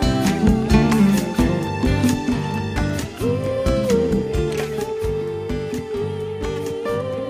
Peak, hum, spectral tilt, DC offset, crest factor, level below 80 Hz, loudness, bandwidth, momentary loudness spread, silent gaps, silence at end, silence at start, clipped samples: -2 dBFS; none; -6.5 dB/octave; under 0.1%; 16 dB; -30 dBFS; -21 LUFS; 15.5 kHz; 9 LU; none; 0 s; 0 s; under 0.1%